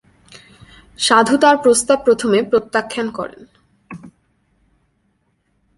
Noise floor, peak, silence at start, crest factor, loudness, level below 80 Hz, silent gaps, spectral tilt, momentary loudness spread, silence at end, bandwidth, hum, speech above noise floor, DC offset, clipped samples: -65 dBFS; 0 dBFS; 1 s; 18 dB; -15 LUFS; -56 dBFS; none; -3 dB/octave; 25 LU; 1.7 s; 11.5 kHz; none; 50 dB; under 0.1%; under 0.1%